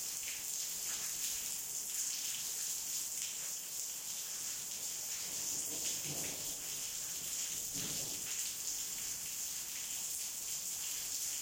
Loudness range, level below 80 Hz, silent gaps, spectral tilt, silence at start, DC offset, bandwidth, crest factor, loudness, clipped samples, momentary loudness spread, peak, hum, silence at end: 1 LU; -72 dBFS; none; 0.5 dB/octave; 0 s; under 0.1%; 16.5 kHz; 20 dB; -38 LUFS; under 0.1%; 3 LU; -20 dBFS; none; 0 s